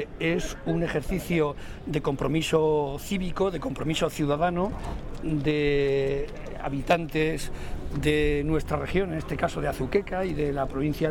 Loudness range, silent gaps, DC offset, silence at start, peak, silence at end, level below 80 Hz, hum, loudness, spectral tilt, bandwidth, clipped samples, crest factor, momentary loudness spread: 1 LU; none; under 0.1%; 0 s; -10 dBFS; 0 s; -38 dBFS; none; -27 LUFS; -6 dB/octave; 17 kHz; under 0.1%; 16 dB; 9 LU